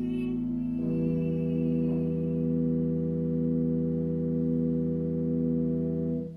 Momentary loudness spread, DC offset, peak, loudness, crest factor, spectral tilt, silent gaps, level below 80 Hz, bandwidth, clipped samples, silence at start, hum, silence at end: 3 LU; under 0.1%; -18 dBFS; -29 LUFS; 10 dB; -12 dB/octave; none; -50 dBFS; 3.2 kHz; under 0.1%; 0 s; none; 0 s